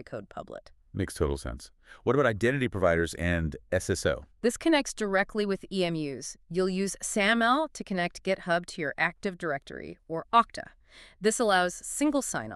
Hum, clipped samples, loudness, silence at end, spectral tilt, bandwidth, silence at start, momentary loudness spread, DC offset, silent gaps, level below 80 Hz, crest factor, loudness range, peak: none; under 0.1%; -28 LUFS; 0 s; -4.5 dB/octave; 13.5 kHz; 0 s; 16 LU; under 0.1%; none; -48 dBFS; 20 dB; 2 LU; -8 dBFS